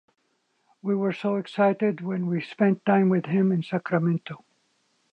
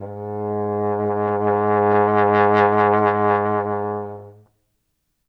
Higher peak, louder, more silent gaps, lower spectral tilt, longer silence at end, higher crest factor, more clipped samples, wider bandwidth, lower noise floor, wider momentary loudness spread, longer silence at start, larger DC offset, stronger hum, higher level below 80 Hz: second, -8 dBFS vs -4 dBFS; second, -25 LUFS vs -19 LUFS; neither; about the same, -9 dB/octave vs -9 dB/octave; second, 0.75 s vs 0.95 s; about the same, 18 dB vs 16 dB; neither; about the same, 5.6 kHz vs 5.4 kHz; about the same, -71 dBFS vs -72 dBFS; second, 8 LU vs 12 LU; first, 0.85 s vs 0 s; neither; neither; second, -74 dBFS vs -68 dBFS